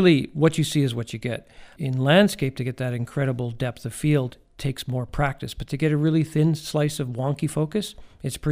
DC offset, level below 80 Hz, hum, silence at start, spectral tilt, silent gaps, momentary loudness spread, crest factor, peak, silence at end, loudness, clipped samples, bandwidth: under 0.1%; -46 dBFS; none; 0 s; -6 dB/octave; none; 12 LU; 18 dB; -4 dBFS; 0 s; -24 LUFS; under 0.1%; 15.5 kHz